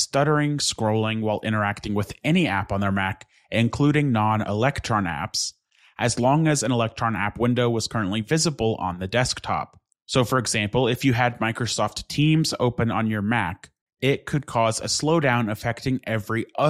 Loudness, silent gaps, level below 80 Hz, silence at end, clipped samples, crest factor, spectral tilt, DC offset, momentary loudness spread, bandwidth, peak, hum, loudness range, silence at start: -23 LUFS; 10.02-10.06 s, 13.81-13.87 s; -50 dBFS; 0 s; under 0.1%; 16 dB; -5 dB/octave; under 0.1%; 6 LU; 15 kHz; -6 dBFS; none; 1 LU; 0 s